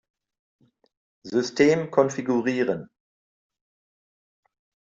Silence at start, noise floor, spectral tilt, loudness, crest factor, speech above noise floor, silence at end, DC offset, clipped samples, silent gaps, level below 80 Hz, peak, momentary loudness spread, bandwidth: 1.25 s; under -90 dBFS; -5.5 dB/octave; -23 LUFS; 22 dB; over 67 dB; 2.05 s; under 0.1%; under 0.1%; none; -70 dBFS; -6 dBFS; 8 LU; 7.8 kHz